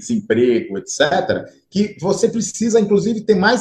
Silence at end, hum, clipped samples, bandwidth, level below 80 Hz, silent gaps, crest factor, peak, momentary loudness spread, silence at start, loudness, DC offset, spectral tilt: 0 s; none; under 0.1%; 11 kHz; -54 dBFS; none; 16 dB; -2 dBFS; 8 LU; 0 s; -17 LUFS; under 0.1%; -4.5 dB/octave